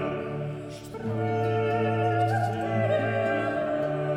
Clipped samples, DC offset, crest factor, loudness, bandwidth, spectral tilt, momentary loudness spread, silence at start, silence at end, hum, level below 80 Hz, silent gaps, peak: under 0.1%; under 0.1%; 12 dB; -27 LUFS; 11.5 kHz; -7.5 dB/octave; 9 LU; 0 s; 0 s; none; -58 dBFS; none; -14 dBFS